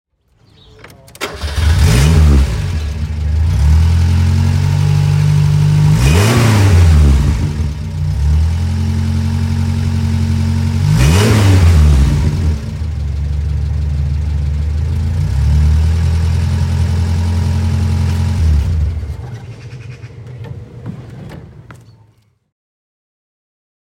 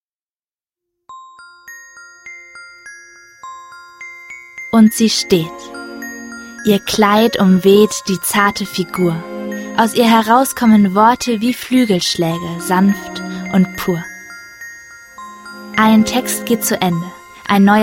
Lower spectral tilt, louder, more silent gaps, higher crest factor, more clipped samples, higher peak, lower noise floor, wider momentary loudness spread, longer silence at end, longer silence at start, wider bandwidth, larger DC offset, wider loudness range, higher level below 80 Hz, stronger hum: first, -6.5 dB/octave vs -5 dB/octave; about the same, -13 LUFS vs -14 LUFS; neither; about the same, 12 dB vs 16 dB; neither; about the same, 0 dBFS vs 0 dBFS; second, -52 dBFS vs under -90 dBFS; second, 19 LU vs 23 LU; first, 2.1 s vs 0 s; about the same, 1.2 s vs 1.1 s; about the same, 15.5 kHz vs 16.5 kHz; neither; first, 10 LU vs 7 LU; first, -18 dBFS vs -50 dBFS; neither